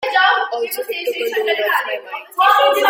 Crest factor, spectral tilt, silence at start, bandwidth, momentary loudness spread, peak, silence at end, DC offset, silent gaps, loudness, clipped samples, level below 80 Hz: 16 dB; 0.5 dB/octave; 0 s; 16.5 kHz; 11 LU; -2 dBFS; 0 s; under 0.1%; none; -17 LUFS; under 0.1%; -74 dBFS